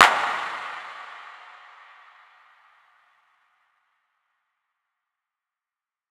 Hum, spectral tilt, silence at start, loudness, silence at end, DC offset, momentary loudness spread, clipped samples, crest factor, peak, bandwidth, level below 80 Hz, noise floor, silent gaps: none; 0 dB/octave; 0 s; -26 LUFS; 4.75 s; under 0.1%; 24 LU; under 0.1%; 30 dB; 0 dBFS; 19 kHz; -78 dBFS; under -90 dBFS; none